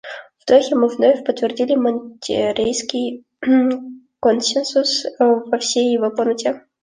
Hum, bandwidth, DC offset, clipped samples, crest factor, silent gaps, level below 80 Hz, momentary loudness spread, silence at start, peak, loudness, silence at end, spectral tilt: none; 10 kHz; under 0.1%; under 0.1%; 16 dB; none; -60 dBFS; 10 LU; 0.05 s; -2 dBFS; -18 LUFS; 0.25 s; -3 dB/octave